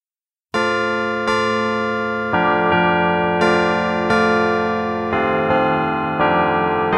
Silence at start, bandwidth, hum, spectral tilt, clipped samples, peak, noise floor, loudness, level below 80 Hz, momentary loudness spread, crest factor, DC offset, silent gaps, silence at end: 0.55 s; 11.5 kHz; none; -6 dB/octave; under 0.1%; -4 dBFS; under -90 dBFS; -18 LUFS; -50 dBFS; 5 LU; 14 dB; under 0.1%; none; 0 s